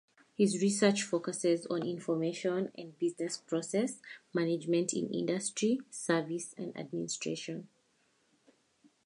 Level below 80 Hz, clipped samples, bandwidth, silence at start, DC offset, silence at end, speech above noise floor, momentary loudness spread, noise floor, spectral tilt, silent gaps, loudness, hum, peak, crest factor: -84 dBFS; under 0.1%; 11.5 kHz; 0.4 s; under 0.1%; 1.4 s; 40 dB; 11 LU; -73 dBFS; -4.5 dB/octave; none; -33 LUFS; none; -14 dBFS; 20 dB